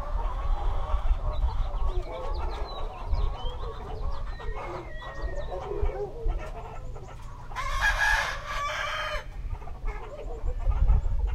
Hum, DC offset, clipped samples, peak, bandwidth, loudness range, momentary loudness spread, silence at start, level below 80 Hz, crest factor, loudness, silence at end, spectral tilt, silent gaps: none; under 0.1%; under 0.1%; -12 dBFS; 12.5 kHz; 7 LU; 13 LU; 0 s; -30 dBFS; 16 dB; -32 LUFS; 0 s; -4.5 dB/octave; none